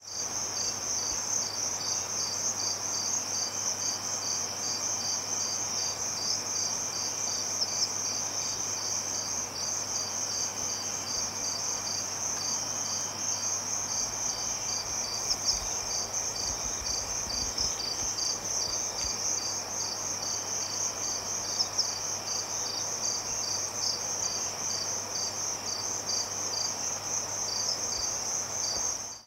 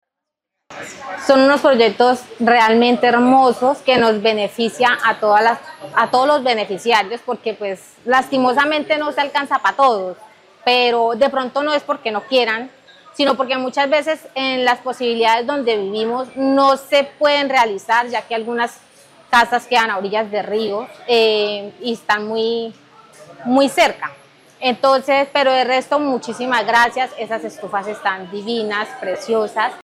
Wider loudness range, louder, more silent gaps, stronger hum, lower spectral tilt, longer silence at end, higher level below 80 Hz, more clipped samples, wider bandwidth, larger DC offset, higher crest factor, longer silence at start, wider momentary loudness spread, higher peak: second, 1 LU vs 5 LU; second, -29 LUFS vs -17 LUFS; neither; neither; second, 0 dB/octave vs -3.5 dB/octave; about the same, 0 s vs 0.05 s; about the same, -58 dBFS vs -62 dBFS; neither; about the same, 16 kHz vs 15.5 kHz; neither; about the same, 18 dB vs 16 dB; second, 0 s vs 0.7 s; second, 2 LU vs 11 LU; second, -14 dBFS vs 0 dBFS